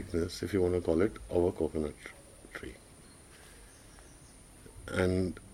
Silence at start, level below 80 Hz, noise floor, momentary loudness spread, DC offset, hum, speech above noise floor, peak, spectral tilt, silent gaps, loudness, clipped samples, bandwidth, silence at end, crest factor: 0 s; -52 dBFS; -55 dBFS; 24 LU; under 0.1%; none; 23 dB; -14 dBFS; -6.5 dB/octave; none; -32 LUFS; under 0.1%; 16 kHz; 0 s; 20 dB